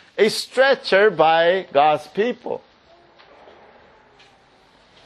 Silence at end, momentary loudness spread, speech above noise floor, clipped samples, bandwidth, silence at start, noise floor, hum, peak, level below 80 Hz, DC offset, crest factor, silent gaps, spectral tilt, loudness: 2.5 s; 12 LU; 36 dB; under 0.1%; 12.5 kHz; 0.15 s; -54 dBFS; none; -2 dBFS; -68 dBFS; under 0.1%; 20 dB; none; -3.5 dB/octave; -18 LUFS